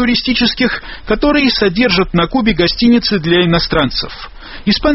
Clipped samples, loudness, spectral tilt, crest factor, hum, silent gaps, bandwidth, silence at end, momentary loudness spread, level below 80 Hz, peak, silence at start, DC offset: under 0.1%; -13 LUFS; -3.5 dB/octave; 14 dB; none; none; 6 kHz; 0 s; 9 LU; -30 dBFS; 0 dBFS; 0 s; under 0.1%